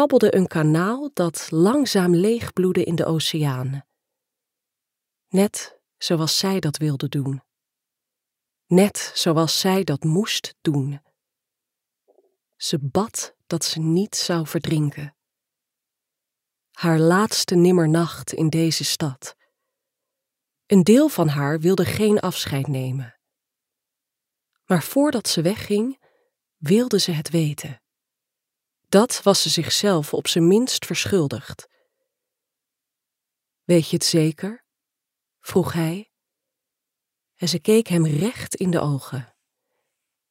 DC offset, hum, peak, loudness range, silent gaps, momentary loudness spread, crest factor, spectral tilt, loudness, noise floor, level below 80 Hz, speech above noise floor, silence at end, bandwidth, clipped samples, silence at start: under 0.1%; none; -2 dBFS; 6 LU; none; 12 LU; 20 dB; -5 dB/octave; -20 LUFS; -85 dBFS; -62 dBFS; 65 dB; 1.05 s; 16 kHz; under 0.1%; 0 s